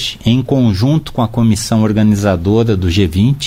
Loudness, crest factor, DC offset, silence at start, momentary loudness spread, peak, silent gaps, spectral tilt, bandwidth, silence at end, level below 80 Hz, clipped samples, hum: -13 LUFS; 10 dB; under 0.1%; 0 s; 3 LU; -2 dBFS; none; -6.5 dB/octave; 16 kHz; 0 s; -32 dBFS; under 0.1%; none